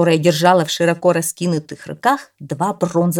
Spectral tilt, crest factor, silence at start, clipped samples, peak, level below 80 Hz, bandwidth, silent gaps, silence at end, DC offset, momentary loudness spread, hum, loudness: -5 dB/octave; 16 dB; 0 s; under 0.1%; 0 dBFS; -64 dBFS; 17.5 kHz; none; 0 s; under 0.1%; 9 LU; none; -17 LUFS